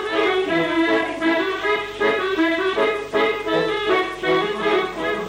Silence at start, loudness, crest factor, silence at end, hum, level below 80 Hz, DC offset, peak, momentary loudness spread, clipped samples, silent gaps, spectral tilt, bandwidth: 0 s; -20 LUFS; 14 dB; 0 s; none; -52 dBFS; under 0.1%; -8 dBFS; 2 LU; under 0.1%; none; -4.5 dB/octave; 16 kHz